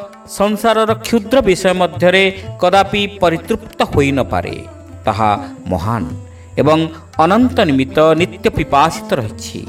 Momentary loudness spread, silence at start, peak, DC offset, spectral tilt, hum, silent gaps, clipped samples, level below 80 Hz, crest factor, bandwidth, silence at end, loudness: 10 LU; 0 s; 0 dBFS; under 0.1%; -5.5 dB/octave; none; none; under 0.1%; -38 dBFS; 14 dB; 16.5 kHz; 0 s; -14 LUFS